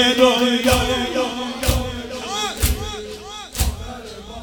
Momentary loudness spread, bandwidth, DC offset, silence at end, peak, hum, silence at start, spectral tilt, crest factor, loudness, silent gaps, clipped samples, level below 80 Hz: 18 LU; over 20 kHz; under 0.1%; 0 s; 0 dBFS; none; 0 s; -4 dB/octave; 20 dB; -20 LUFS; none; under 0.1%; -28 dBFS